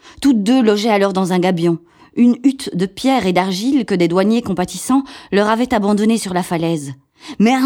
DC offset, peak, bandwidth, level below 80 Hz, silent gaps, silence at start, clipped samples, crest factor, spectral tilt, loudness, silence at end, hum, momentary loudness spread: under 0.1%; 0 dBFS; 17 kHz; -50 dBFS; none; 0.05 s; under 0.1%; 16 dB; -5.5 dB/octave; -16 LUFS; 0 s; none; 8 LU